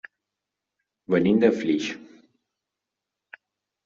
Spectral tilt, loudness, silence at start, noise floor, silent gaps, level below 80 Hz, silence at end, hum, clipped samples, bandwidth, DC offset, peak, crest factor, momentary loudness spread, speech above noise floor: -5.5 dB/octave; -23 LUFS; 1.1 s; -86 dBFS; none; -68 dBFS; 1.8 s; none; under 0.1%; 7.6 kHz; under 0.1%; -6 dBFS; 22 dB; 13 LU; 64 dB